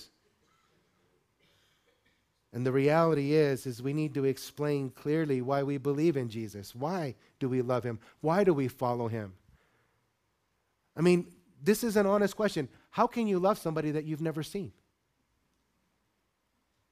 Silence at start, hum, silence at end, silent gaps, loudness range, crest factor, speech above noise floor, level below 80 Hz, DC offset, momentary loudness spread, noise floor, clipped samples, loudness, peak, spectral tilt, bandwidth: 0 s; none; 2.2 s; none; 4 LU; 20 dB; 48 dB; -68 dBFS; under 0.1%; 12 LU; -77 dBFS; under 0.1%; -30 LUFS; -12 dBFS; -6.5 dB/octave; 15.5 kHz